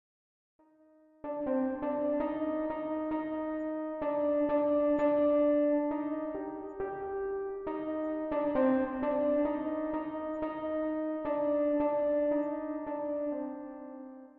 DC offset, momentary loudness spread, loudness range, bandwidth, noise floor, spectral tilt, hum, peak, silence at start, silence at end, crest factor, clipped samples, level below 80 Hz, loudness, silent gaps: under 0.1%; 10 LU; 4 LU; 4 kHz; -63 dBFS; -9 dB/octave; none; -18 dBFS; 1.25 s; 0.1 s; 14 dB; under 0.1%; -62 dBFS; -32 LUFS; none